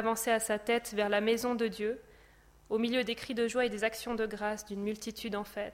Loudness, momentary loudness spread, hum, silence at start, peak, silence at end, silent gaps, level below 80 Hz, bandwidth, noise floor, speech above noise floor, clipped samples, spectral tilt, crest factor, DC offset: -33 LUFS; 8 LU; none; 0 s; -16 dBFS; 0 s; none; -62 dBFS; 16.5 kHz; -60 dBFS; 28 dB; under 0.1%; -3.5 dB/octave; 18 dB; under 0.1%